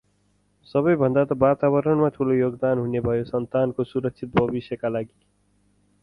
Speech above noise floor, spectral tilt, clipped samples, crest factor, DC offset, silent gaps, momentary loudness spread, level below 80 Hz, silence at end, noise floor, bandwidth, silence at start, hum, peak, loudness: 43 dB; -10 dB/octave; under 0.1%; 20 dB; under 0.1%; none; 8 LU; -52 dBFS; 0.95 s; -65 dBFS; 5.4 kHz; 0.75 s; 50 Hz at -50 dBFS; -4 dBFS; -23 LUFS